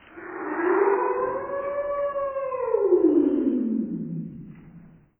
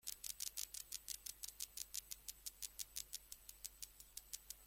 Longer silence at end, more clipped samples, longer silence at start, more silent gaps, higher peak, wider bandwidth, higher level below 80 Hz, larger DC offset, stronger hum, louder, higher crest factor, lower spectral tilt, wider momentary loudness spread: first, 0.3 s vs 0 s; neither; about the same, 0.1 s vs 0.05 s; neither; first, -8 dBFS vs -22 dBFS; second, 3.2 kHz vs 17 kHz; first, -60 dBFS vs -70 dBFS; neither; neither; first, -25 LUFS vs -49 LUFS; second, 18 dB vs 30 dB; first, -12 dB/octave vs 2 dB/octave; first, 15 LU vs 7 LU